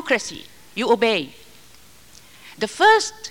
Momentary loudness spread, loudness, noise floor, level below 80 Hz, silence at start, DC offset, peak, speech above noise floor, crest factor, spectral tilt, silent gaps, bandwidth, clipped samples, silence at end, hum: 19 LU; -19 LUFS; -50 dBFS; -60 dBFS; 0 s; 0.3%; -4 dBFS; 30 dB; 18 dB; -2.5 dB/octave; none; 17 kHz; under 0.1%; 0 s; none